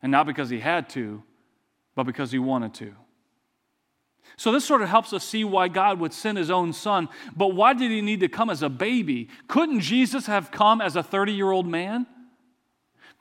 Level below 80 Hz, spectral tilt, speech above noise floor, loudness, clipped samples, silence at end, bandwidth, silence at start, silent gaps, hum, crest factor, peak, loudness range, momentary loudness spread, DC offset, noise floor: -78 dBFS; -5 dB/octave; 51 dB; -24 LUFS; under 0.1%; 1 s; 16 kHz; 0.05 s; none; none; 20 dB; -4 dBFS; 7 LU; 11 LU; under 0.1%; -74 dBFS